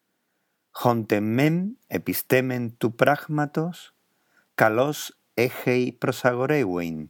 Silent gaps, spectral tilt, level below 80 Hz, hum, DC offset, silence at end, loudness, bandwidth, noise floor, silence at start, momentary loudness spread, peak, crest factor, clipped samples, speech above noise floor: none; -6 dB/octave; -68 dBFS; none; under 0.1%; 0 s; -24 LUFS; 19 kHz; -74 dBFS; 0.75 s; 9 LU; -2 dBFS; 24 dB; under 0.1%; 51 dB